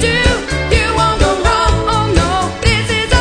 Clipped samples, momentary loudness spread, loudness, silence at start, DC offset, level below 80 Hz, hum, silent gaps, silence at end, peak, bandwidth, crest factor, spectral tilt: under 0.1%; 2 LU; -13 LUFS; 0 s; under 0.1%; -20 dBFS; none; none; 0 s; 0 dBFS; 10.5 kHz; 12 dB; -4.5 dB/octave